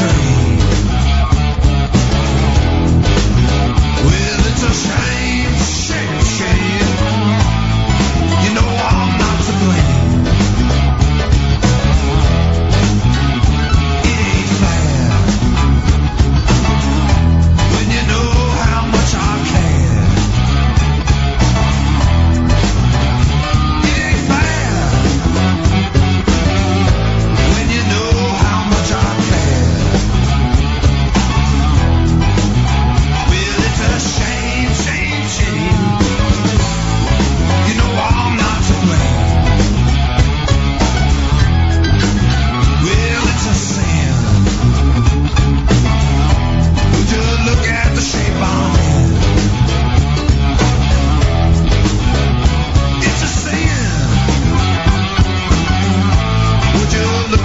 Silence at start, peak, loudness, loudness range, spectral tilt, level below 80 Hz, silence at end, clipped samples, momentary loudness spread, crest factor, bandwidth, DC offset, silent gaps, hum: 0 s; -2 dBFS; -13 LUFS; 1 LU; -5.5 dB/octave; -18 dBFS; 0 s; under 0.1%; 2 LU; 10 dB; 8 kHz; 1%; none; none